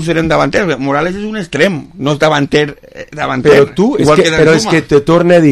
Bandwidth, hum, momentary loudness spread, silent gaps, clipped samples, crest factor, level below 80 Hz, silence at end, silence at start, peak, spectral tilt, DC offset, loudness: 13 kHz; none; 10 LU; none; 0.3%; 10 dB; -38 dBFS; 0 s; 0 s; 0 dBFS; -5.5 dB/octave; under 0.1%; -11 LUFS